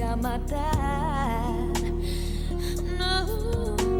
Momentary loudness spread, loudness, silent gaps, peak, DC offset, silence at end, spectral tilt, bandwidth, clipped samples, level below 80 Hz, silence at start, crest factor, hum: 4 LU; -28 LUFS; none; -10 dBFS; under 0.1%; 0 s; -5.5 dB/octave; 19.5 kHz; under 0.1%; -30 dBFS; 0 s; 16 dB; none